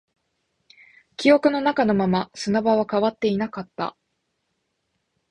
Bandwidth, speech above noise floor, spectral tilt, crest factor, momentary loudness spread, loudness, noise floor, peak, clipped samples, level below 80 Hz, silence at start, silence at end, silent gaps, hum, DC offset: 10.5 kHz; 54 dB; -6 dB/octave; 20 dB; 13 LU; -22 LUFS; -75 dBFS; -4 dBFS; under 0.1%; -60 dBFS; 1.2 s; 1.4 s; none; none; under 0.1%